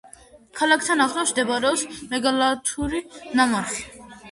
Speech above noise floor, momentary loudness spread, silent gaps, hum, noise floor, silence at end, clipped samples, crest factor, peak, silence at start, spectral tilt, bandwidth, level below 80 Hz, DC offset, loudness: 26 dB; 11 LU; none; none; -49 dBFS; 0 s; under 0.1%; 18 dB; -6 dBFS; 0.05 s; -2 dB/octave; 11.5 kHz; -50 dBFS; under 0.1%; -22 LUFS